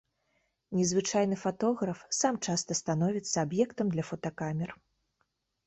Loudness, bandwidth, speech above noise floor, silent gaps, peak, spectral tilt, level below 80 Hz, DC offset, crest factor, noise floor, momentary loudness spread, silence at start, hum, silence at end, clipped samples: -31 LUFS; 8.4 kHz; 48 dB; none; -14 dBFS; -4.5 dB/octave; -66 dBFS; under 0.1%; 18 dB; -78 dBFS; 7 LU; 0.7 s; none; 0.95 s; under 0.1%